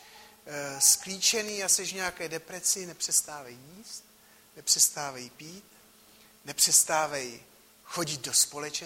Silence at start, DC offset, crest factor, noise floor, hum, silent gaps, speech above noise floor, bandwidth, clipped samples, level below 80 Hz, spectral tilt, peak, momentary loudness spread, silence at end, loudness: 0 s; under 0.1%; 24 dB; -58 dBFS; none; none; 29 dB; 16 kHz; under 0.1%; -70 dBFS; 0 dB/octave; -8 dBFS; 22 LU; 0 s; -25 LUFS